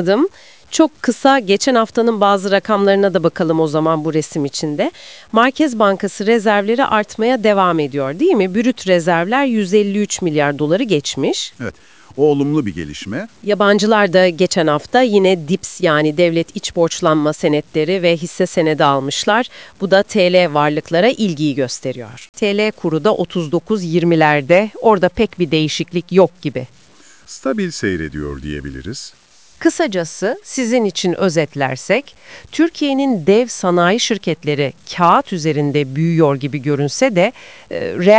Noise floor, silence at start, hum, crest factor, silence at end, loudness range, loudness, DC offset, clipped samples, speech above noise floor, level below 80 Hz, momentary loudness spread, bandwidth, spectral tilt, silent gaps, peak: -46 dBFS; 0 s; none; 16 dB; 0 s; 4 LU; -15 LUFS; 0.4%; under 0.1%; 31 dB; -48 dBFS; 10 LU; 8 kHz; -5 dB/octave; 22.29-22.33 s; 0 dBFS